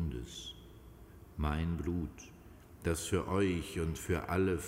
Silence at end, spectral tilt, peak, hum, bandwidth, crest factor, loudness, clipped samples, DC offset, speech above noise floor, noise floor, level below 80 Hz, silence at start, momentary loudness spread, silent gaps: 0 s; -5.5 dB/octave; -18 dBFS; none; 16 kHz; 18 dB; -36 LUFS; under 0.1%; under 0.1%; 20 dB; -55 dBFS; -46 dBFS; 0 s; 23 LU; none